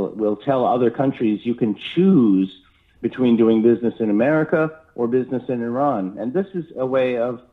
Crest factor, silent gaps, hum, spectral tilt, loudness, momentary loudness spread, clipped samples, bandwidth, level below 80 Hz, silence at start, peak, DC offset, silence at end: 14 dB; none; none; -9.5 dB/octave; -20 LUFS; 9 LU; under 0.1%; 4.2 kHz; -62 dBFS; 0 s; -4 dBFS; under 0.1%; 0.15 s